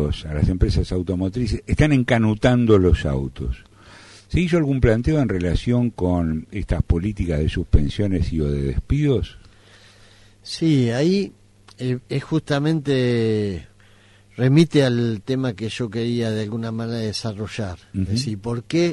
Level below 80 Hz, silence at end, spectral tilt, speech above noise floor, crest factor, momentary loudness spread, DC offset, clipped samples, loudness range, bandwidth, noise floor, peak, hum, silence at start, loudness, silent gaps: -30 dBFS; 0 s; -7 dB/octave; 31 dB; 16 dB; 11 LU; under 0.1%; under 0.1%; 4 LU; 11.5 kHz; -51 dBFS; -4 dBFS; none; 0 s; -21 LUFS; none